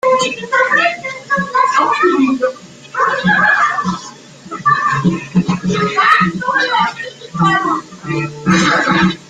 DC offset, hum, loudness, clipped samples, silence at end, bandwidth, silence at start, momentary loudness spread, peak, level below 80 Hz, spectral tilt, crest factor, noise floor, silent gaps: under 0.1%; none; -14 LUFS; under 0.1%; 0.05 s; 9.4 kHz; 0.05 s; 11 LU; 0 dBFS; -50 dBFS; -5 dB/octave; 14 dB; -35 dBFS; none